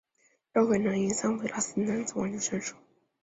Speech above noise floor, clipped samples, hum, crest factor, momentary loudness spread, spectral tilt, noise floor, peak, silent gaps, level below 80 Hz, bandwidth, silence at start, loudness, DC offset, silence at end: 41 dB; under 0.1%; none; 18 dB; 6 LU; -4.5 dB/octave; -70 dBFS; -12 dBFS; none; -66 dBFS; 8 kHz; 0.55 s; -29 LUFS; under 0.1%; 0.5 s